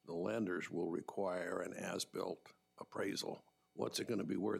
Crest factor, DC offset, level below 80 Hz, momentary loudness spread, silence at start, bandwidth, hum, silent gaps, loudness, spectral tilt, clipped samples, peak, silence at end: 16 dB; under 0.1%; -86 dBFS; 10 LU; 0.05 s; 16 kHz; none; none; -42 LUFS; -4.5 dB/octave; under 0.1%; -26 dBFS; 0 s